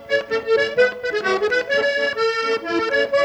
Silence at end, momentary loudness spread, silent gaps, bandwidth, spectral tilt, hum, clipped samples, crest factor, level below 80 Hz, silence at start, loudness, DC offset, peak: 0 s; 3 LU; none; 9.6 kHz; -3 dB/octave; none; under 0.1%; 14 dB; -58 dBFS; 0 s; -20 LUFS; under 0.1%; -6 dBFS